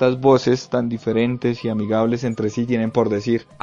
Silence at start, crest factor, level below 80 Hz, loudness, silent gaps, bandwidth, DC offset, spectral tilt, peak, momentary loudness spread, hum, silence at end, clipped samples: 0 s; 16 dB; -52 dBFS; -20 LUFS; none; 7.4 kHz; under 0.1%; -7 dB/octave; -2 dBFS; 7 LU; none; 0.2 s; under 0.1%